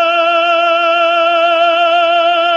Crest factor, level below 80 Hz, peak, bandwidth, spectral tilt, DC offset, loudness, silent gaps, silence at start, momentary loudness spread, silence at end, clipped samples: 10 dB; -58 dBFS; -2 dBFS; 7.4 kHz; -1.5 dB/octave; under 0.1%; -11 LUFS; none; 0 s; 1 LU; 0 s; under 0.1%